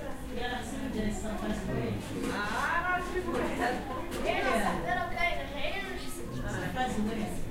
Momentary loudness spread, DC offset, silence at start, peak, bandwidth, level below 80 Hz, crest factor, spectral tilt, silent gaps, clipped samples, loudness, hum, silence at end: 7 LU; under 0.1%; 0 s; -16 dBFS; 16 kHz; -42 dBFS; 16 dB; -5 dB/octave; none; under 0.1%; -33 LUFS; none; 0 s